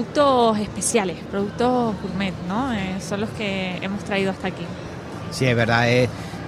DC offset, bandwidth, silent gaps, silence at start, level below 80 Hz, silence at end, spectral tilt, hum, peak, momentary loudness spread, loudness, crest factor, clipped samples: under 0.1%; 15.5 kHz; none; 0 s; -46 dBFS; 0 s; -5 dB/octave; none; -2 dBFS; 11 LU; -22 LUFS; 20 dB; under 0.1%